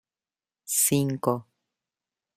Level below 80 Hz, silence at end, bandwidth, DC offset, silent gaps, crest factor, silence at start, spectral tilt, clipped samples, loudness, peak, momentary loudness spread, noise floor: -66 dBFS; 0.95 s; 16 kHz; under 0.1%; none; 22 dB; 0.65 s; -4.5 dB/octave; under 0.1%; -25 LUFS; -8 dBFS; 8 LU; under -90 dBFS